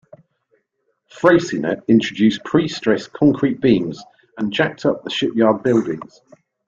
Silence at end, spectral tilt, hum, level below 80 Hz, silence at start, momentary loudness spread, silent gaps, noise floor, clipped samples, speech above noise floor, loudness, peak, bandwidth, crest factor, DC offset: 0.65 s; -6 dB/octave; none; -56 dBFS; 1.15 s; 9 LU; none; -70 dBFS; under 0.1%; 53 dB; -18 LUFS; -2 dBFS; 7.6 kHz; 16 dB; under 0.1%